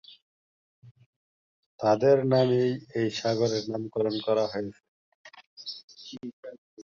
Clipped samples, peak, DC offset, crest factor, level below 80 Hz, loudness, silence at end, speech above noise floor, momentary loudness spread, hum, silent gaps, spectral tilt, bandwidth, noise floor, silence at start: under 0.1%; -10 dBFS; under 0.1%; 20 dB; -68 dBFS; -26 LUFS; 0 s; over 65 dB; 20 LU; none; 0.22-0.82 s, 0.91-0.95 s, 1.06-1.79 s, 4.88-5.25 s, 5.47-5.57 s, 5.84-5.88 s, 6.33-6.43 s, 6.58-6.77 s; -6 dB/octave; 7.6 kHz; under -90 dBFS; 0.1 s